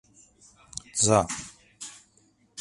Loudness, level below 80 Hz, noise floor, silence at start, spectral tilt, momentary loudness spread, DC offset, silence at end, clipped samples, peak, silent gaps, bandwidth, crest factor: -25 LUFS; -56 dBFS; -64 dBFS; 0.75 s; -3.5 dB/octave; 22 LU; under 0.1%; 0 s; under 0.1%; -6 dBFS; none; 11.5 kHz; 24 dB